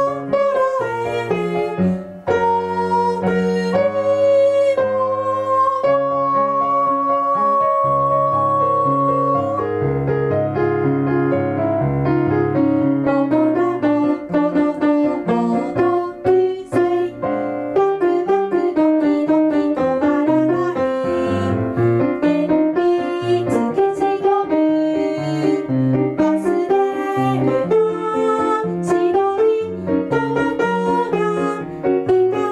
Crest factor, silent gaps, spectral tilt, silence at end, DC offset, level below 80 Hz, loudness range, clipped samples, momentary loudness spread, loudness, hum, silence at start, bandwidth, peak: 10 dB; none; -8 dB/octave; 0 s; under 0.1%; -50 dBFS; 2 LU; under 0.1%; 4 LU; -18 LUFS; none; 0 s; 11 kHz; -6 dBFS